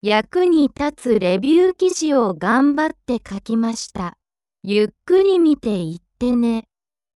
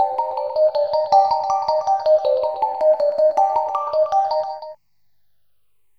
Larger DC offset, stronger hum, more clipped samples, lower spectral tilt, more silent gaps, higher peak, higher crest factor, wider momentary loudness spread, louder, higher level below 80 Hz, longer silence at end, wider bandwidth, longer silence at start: second, under 0.1% vs 0.2%; second, none vs 50 Hz at -75 dBFS; neither; first, -5 dB/octave vs -3 dB/octave; neither; about the same, -4 dBFS vs -4 dBFS; about the same, 14 dB vs 16 dB; first, 11 LU vs 7 LU; about the same, -18 LUFS vs -19 LUFS; first, -50 dBFS vs -62 dBFS; second, 0.55 s vs 1.25 s; first, 12 kHz vs 6.4 kHz; about the same, 0.05 s vs 0 s